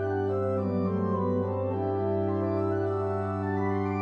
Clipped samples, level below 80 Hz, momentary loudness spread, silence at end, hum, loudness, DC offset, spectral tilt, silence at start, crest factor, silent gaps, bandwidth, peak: under 0.1%; -66 dBFS; 2 LU; 0 s; none; -29 LUFS; under 0.1%; -10.5 dB/octave; 0 s; 12 dB; none; 5.2 kHz; -16 dBFS